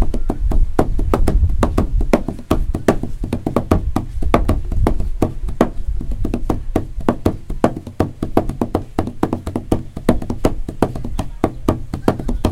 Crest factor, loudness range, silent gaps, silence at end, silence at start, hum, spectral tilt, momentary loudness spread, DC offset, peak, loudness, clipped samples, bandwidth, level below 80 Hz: 16 dB; 2 LU; none; 0 s; 0 s; none; -7.5 dB/octave; 6 LU; under 0.1%; 0 dBFS; -21 LUFS; under 0.1%; 15.5 kHz; -22 dBFS